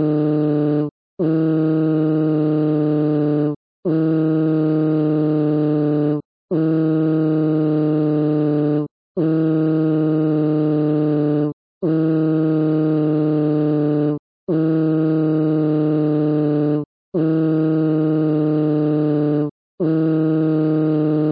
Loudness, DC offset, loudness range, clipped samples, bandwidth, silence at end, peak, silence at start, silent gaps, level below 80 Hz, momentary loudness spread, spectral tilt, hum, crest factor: -18 LUFS; under 0.1%; 0 LU; under 0.1%; 4.9 kHz; 0 s; -8 dBFS; 0 s; 0.91-1.17 s, 3.56-3.83 s, 6.25-6.48 s, 8.91-9.15 s, 11.53-11.81 s, 14.19-14.47 s, 16.86-17.12 s, 19.51-19.78 s; -68 dBFS; 4 LU; -14 dB/octave; none; 8 dB